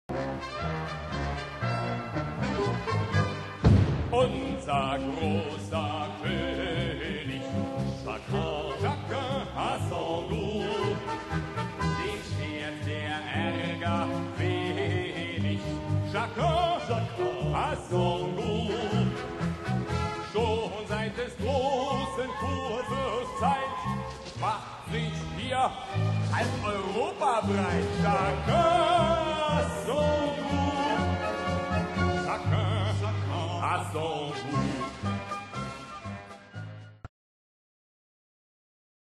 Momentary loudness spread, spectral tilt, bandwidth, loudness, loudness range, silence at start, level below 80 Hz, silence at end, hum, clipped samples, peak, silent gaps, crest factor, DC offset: 7 LU; -6 dB/octave; 12 kHz; -30 LUFS; 6 LU; 0.1 s; -44 dBFS; 2.1 s; none; under 0.1%; -10 dBFS; none; 20 dB; under 0.1%